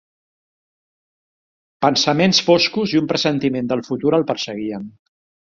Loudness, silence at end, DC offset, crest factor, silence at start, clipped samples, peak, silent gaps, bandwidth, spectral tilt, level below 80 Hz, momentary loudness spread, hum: -18 LUFS; 0.5 s; under 0.1%; 18 dB; 1.8 s; under 0.1%; -2 dBFS; none; 7.8 kHz; -4.5 dB/octave; -60 dBFS; 12 LU; none